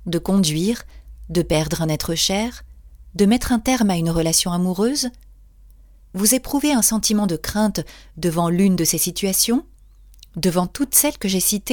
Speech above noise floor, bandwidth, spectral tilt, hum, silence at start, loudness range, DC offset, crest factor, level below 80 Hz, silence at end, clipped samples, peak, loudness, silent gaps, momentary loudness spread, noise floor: 27 dB; 19.5 kHz; -4 dB/octave; none; 0 s; 2 LU; under 0.1%; 20 dB; -40 dBFS; 0 s; under 0.1%; 0 dBFS; -19 LUFS; none; 8 LU; -47 dBFS